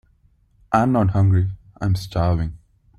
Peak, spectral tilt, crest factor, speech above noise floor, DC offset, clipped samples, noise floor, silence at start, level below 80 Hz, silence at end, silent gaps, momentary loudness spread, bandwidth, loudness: -4 dBFS; -8.5 dB/octave; 18 dB; 40 dB; under 0.1%; under 0.1%; -58 dBFS; 0.7 s; -40 dBFS; 0.4 s; none; 10 LU; 11.5 kHz; -21 LUFS